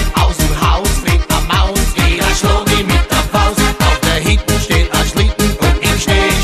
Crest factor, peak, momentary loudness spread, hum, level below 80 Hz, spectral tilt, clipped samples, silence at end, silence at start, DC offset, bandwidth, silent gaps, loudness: 12 dB; 0 dBFS; 2 LU; none; -16 dBFS; -4 dB/octave; under 0.1%; 0 s; 0 s; under 0.1%; 14.5 kHz; none; -13 LUFS